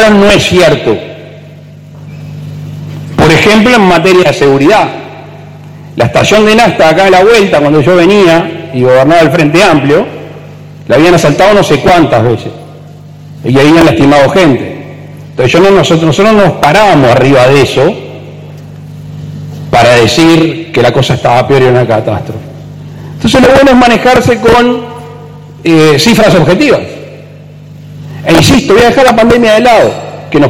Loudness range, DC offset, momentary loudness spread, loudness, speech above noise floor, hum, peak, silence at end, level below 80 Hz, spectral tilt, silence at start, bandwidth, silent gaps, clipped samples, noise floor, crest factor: 3 LU; under 0.1%; 21 LU; -5 LUFS; 25 dB; none; 0 dBFS; 0 s; -32 dBFS; -5.5 dB/octave; 0 s; 16.5 kHz; none; 0.7%; -29 dBFS; 6 dB